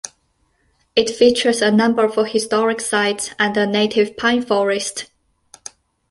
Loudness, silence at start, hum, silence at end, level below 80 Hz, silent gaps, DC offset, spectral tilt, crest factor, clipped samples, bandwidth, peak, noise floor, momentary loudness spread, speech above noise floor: -17 LUFS; 0.05 s; none; 1.05 s; -58 dBFS; none; under 0.1%; -3.5 dB/octave; 16 dB; under 0.1%; 11.5 kHz; -2 dBFS; -64 dBFS; 20 LU; 47 dB